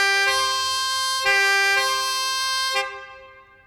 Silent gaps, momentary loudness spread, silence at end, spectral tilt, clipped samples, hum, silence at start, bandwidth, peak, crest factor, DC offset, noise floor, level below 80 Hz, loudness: none; 6 LU; 0.35 s; 1.5 dB/octave; under 0.1%; none; 0 s; over 20 kHz; -6 dBFS; 16 dB; under 0.1%; -47 dBFS; -60 dBFS; -19 LUFS